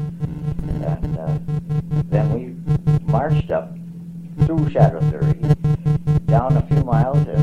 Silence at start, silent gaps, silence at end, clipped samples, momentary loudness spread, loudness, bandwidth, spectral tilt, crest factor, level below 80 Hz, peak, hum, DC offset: 0 s; none; 0 s; under 0.1%; 10 LU; -19 LUFS; 4.6 kHz; -10 dB/octave; 16 dB; -34 dBFS; -2 dBFS; none; 0.2%